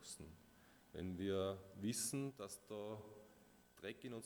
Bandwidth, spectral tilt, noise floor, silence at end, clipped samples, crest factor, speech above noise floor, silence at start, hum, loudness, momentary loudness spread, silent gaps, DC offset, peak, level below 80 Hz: over 20 kHz; -4.5 dB/octave; -69 dBFS; 0 s; under 0.1%; 18 dB; 22 dB; 0 s; none; -47 LUFS; 23 LU; none; under 0.1%; -30 dBFS; -74 dBFS